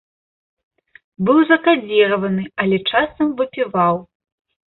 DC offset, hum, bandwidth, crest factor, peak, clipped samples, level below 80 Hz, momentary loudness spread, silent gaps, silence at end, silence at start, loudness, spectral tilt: under 0.1%; none; 4.2 kHz; 16 dB; -2 dBFS; under 0.1%; -56 dBFS; 8 LU; none; 0.65 s; 1.2 s; -17 LUFS; -11 dB/octave